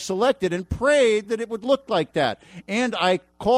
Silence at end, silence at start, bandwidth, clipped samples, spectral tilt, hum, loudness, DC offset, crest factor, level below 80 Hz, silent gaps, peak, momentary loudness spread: 0 s; 0 s; 13 kHz; under 0.1%; -4.5 dB/octave; none; -22 LUFS; under 0.1%; 14 dB; -46 dBFS; none; -8 dBFS; 8 LU